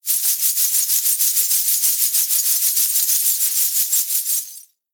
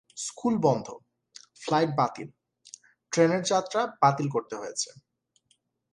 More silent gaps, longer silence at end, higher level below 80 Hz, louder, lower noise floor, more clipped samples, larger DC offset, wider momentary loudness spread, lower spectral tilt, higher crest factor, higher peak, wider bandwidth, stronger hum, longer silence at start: neither; second, 0.3 s vs 0.95 s; second, under -90 dBFS vs -72 dBFS; first, -15 LUFS vs -27 LUFS; second, -40 dBFS vs -71 dBFS; neither; neither; second, 3 LU vs 21 LU; second, 9 dB/octave vs -5 dB/octave; about the same, 18 dB vs 22 dB; first, -2 dBFS vs -8 dBFS; first, over 20 kHz vs 11.5 kHz; neither; about the same, 0.05 s vs 0.15 s